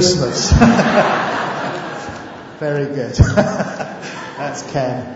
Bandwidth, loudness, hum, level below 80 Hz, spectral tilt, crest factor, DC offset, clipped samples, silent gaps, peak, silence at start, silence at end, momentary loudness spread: 8 kHz; -17 LUFS; none; -28 dBFS; -5 dB/octave; 16 dB; under 0.1%; under 0.1%; none; 0 dBFS; 0 s; 0 s; 17 LU